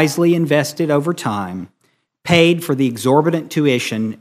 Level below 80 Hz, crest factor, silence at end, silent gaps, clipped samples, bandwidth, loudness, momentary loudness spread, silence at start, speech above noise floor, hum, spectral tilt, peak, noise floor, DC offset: -56 dBFS; 16 dB; 0.05 s; none; under 0.1%; 15.5 kHz; -16 LUFS; 10 LU; 0 s; 48 dB; none; -5.5 dB/octave; 0 dBFS; -64 dBFS; under 0.1%